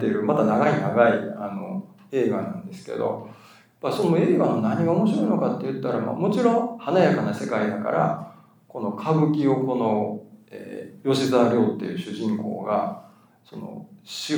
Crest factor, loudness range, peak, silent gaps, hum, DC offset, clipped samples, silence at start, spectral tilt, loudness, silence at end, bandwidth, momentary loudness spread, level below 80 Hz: 18 dB; 3 LU; -4 dBFS; none; none; under 0.1%; under 0.1%; 0 s; -7 dB/octave; -23 LUFS; 0 s; 19.5 kHz; 18 LU; -78 dBFS